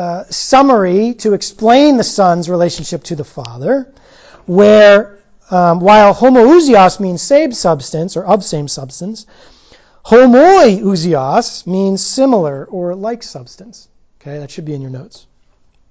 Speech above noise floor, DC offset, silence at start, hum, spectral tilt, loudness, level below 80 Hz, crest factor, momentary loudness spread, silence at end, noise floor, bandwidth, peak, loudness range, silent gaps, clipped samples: 40 dB; under 0.1%; 0 s; none; -5.5 dB/octave; -10 LUFS; -48 dBFS; 12 dB; 19 LU; 0.85 s; -50 dBFS; 8 kHz; 0 dBFS; 10 LU; none; 0.2%